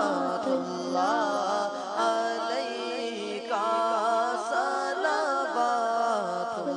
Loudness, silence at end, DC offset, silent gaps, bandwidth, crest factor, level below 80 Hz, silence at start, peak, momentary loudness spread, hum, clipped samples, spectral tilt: -28 LUFS; 0 s; under 0.1%; none; 10.5 kHz; 16 dB; -82 dBFS; 0 s; -12 dBFS; 5 LU; none; under 0.1%; -3.5 dB/octave